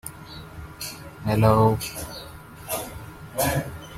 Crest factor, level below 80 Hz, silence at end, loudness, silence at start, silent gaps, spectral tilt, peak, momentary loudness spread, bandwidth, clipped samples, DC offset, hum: 20 dB; -46 dBFS; 0 s; -24 LUFS; 0.05 s; none; -5.5 dB/octave; -4 dBFS; 21 LU; 16.5 kHz; under 0.1%; under 0.1%; none